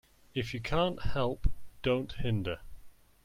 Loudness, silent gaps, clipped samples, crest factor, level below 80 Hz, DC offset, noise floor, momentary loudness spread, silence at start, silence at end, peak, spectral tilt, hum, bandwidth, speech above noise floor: -34 LUFS; none; under 0.1%; 18 dB; -40 dBFS; under 0.1%; -50 dBFS; 8 LU; 0.35 s; 0.35 s; -14 dBFS; -7 dB/octave; none; 14 kHz; 20 dB